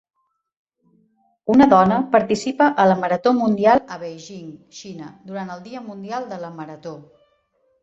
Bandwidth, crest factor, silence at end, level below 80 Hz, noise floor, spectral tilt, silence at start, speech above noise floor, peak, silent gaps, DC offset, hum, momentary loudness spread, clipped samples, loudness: 8 kHz; 20 dB; 0.85 s; -58 dBFS; -65 dBFS; -6.5 dB/octave; 1.45 s; 46 dB; -2 dBFS; none; under 0.1%; none; 22 LU; under 0.1%; -17 LUFS